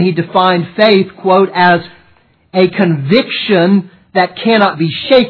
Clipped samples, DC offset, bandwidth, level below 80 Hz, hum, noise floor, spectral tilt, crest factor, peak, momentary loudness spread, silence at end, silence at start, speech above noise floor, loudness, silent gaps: 0.2%; under 0.1%; 5.4 kHz; -54 dBFS; none; -50 dBFS; -8.5 dB/octave; 12 dB; 0 dBFS; 5 LU; 0 s; 0 s; 39 dB; -11 LUFS; none